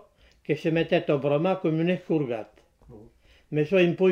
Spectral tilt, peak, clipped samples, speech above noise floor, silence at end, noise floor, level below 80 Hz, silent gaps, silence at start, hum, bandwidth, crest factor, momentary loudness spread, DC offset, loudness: -8 dB/octave; -10 dBFS; under 0.1%; 31 dB; 0 s; -55 dBFS; -62 dBFS; none; 0.5 s; none; 7.2 kHz; 16 dB; 10 LU; under 0.1%; -25 LUFS